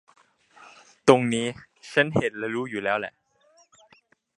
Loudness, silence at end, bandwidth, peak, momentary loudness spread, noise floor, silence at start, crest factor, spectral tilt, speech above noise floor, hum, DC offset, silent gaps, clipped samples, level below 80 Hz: -24 LUFS; 1.3 s; 11 kHz; 0 dBFS; 12 LU; -61 dBFS; 1.05 s; 26 dB; -5 dB/octave; 38 dB; none; under 0.1%; none; under 0.1%; -64 dBFS